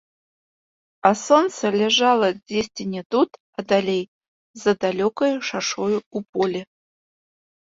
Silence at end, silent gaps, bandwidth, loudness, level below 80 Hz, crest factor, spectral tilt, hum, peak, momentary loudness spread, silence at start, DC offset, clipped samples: 1.1 s; 3.05-3.10 s, 3.40-3.53 s, 4.08-4.21 s, 4.28-4.54 s, 6.06-6.11 s, 6.29-6.33 s; 8 kHz; -21 LUFS; -64 dBFS; 20 dB; -4 dB/octave; none; -2 dBFS; 10 LU; 1.05 s; under 0.1%; under 0.1%